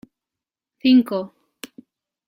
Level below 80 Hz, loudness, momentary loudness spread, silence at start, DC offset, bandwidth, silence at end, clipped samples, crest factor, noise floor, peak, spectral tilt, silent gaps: -68 dBFS; -19 LUFS; 24 LU; 0.85 s; under 0.1%; 15.5 kHz; 1 s; under 0.1%; 16 dB; -88 dBFS; -6 dBFS; -5.5 dB/octave; none